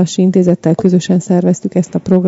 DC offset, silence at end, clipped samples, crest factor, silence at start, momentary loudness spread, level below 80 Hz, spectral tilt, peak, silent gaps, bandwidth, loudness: under 0.1%; 0 s; 0.4%; 12 dB; 0 s; 5 LU; -52 dBFS; -7.5 dB/octave; 0 dBFS; none; 7.8 kHz; -12 LUFS